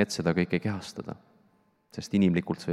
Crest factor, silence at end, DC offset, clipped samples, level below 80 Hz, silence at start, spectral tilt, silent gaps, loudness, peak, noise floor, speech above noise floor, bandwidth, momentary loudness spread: 20 dB; 0 s; under 0.1%; under 0.1%; -64 dBFS; 0 s; -6 dB/octave; none; -28 LUFS; -8 dBFS; -67 dBFS; 38 dB; 13 kHz; 18 LU